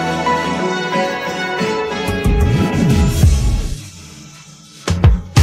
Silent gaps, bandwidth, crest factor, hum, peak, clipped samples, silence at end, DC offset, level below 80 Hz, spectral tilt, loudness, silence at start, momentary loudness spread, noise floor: none; 16 kHz; 16 dB; none; 0 dBFS; under 0.1%; 0 s; under 0.1%; -22 dBFS; -6 dB/octave; -16 LUFS; 0 s; 17 LU; -39 dBFS